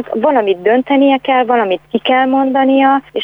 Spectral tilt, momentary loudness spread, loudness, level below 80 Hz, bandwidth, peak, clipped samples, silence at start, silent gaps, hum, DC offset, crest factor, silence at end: -7 dB/octave; 3 LU; -12 LUFS; -58 dBFS; 3.9 kHz; -2 dBFS; under 0.1%; 0 s; none; none; under 0.1%; 10 dB; 0 s